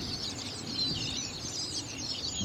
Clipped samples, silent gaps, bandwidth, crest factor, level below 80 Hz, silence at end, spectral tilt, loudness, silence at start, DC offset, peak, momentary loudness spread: under 0.1%; none; 16 kHz; 16 dB; -54 dBFS; 0 s; -2 dB/octave; -33 LUFS; 0 s; under 0.1%; -20 dBFS; 5 LU